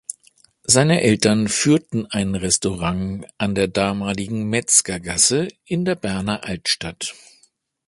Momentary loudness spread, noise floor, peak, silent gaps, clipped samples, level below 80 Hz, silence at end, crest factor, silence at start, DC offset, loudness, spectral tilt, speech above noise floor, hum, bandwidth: 10 LU; -60 dBFS; 0 dBFS; none; under 0.1%; -46 dBFS; 0.75 s; 20 dB; 0.1 s; under 0.1%; -19 LUFS; -3.5 dB/octave; 40 dB; none; 11.5 kHz